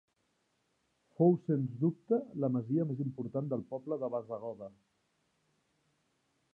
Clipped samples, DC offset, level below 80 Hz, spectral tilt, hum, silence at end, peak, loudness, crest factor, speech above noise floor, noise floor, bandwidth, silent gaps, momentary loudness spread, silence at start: under 0.1%; under 0.1%; -80 dBFS; -12.5 dB/octave; none; 1.85 s; -14 dBFS; -34 LUFS; 22 dB; 45 dB; -78 dBFS; 3 kHz; none; 13 LU; 1.2 s